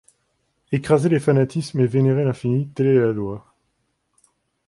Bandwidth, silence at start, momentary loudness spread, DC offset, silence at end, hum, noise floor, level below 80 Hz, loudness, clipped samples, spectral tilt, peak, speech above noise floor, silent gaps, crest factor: 11.5 kHz; 0.7 s; 9 LU; under 0.1%; 1.3 s; none; -71 dBFS; -56 dBFS; -20 LUFS; under 0.1%; -8 dB/octave; -4 dBFS; 52 dB; none; 16 dB